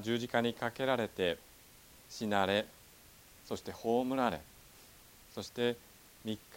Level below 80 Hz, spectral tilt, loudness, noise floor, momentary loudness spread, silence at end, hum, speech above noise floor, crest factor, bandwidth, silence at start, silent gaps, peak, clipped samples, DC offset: -66 dBFS; -5 dB/octave; -35 LUFS; -59 dBFS; 24 LU; 0 s; none; 24 dB; 22 dB; 17.5 kHz; 0 s; none; -14 dBFS; under 0.1%; under 0.1%